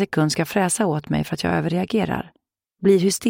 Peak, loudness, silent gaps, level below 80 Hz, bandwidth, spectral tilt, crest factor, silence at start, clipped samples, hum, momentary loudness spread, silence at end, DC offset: -4 dBFS; -21 LUFS; none; -50 dBFS; 16.5 kHz; -5 dB/octave; 16 dB; 0 s; under 0.1%; none; 7 LU; 0 s; under 0.1%